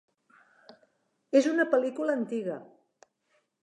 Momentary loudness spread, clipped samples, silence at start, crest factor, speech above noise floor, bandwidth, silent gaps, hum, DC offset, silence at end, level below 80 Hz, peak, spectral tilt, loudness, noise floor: 11 LU; under 0.1%; 1.35 s; 20 dB; 47 dB; 11 kHz; none; none; under 0.1%; 1 s; -90 dBFS; -10 dBFS; -5 dB/octave; -28 LUFS; -74 dBFS